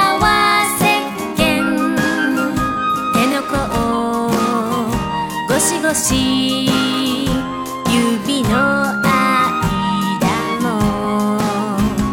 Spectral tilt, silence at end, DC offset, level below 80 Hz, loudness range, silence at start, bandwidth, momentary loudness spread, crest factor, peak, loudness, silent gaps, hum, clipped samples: -4 dB/octave; 0 s; under 0.1%; -36 dBFS; 1 LU; 0 s; 18.5 kHz; 5 LU; 16 dB; 0 dBFS; -16 LUFS; none; none; under 0.1%